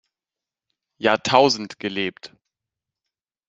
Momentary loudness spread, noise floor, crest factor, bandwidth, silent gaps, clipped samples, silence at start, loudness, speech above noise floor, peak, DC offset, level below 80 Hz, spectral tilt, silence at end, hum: 11 LU; -89 dBFS; 24 dB; 8 kHz; none; under 0.1%; 1 s; -20 LUFS; 69 dB; 0 dBFS; under 0.1%; -66 dBFS; -3.5 dB/octave; 1.2 s; none